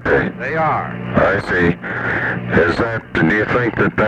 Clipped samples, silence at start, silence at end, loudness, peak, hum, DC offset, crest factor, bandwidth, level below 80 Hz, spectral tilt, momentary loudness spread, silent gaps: under 0.1%; 0 s; 0 s; -17 LUFS; 0 dBFS; none; under 0.1%; 16 dB; 9.4 kHz; -38 dBFS; -7.5 dB/octave; 5 LU; none